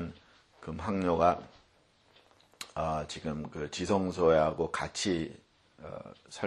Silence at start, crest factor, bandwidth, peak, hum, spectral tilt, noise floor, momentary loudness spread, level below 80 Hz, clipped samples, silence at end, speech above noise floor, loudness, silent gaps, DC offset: 0 s; 22 dB; 12 kHz; -12 dBFS; none; -5 dB/octave; -66 dBFS; 20 LU; -56 dBFS; under 0.1%; 0 s; 35 dB; -31 LUFS; none; under 0.1%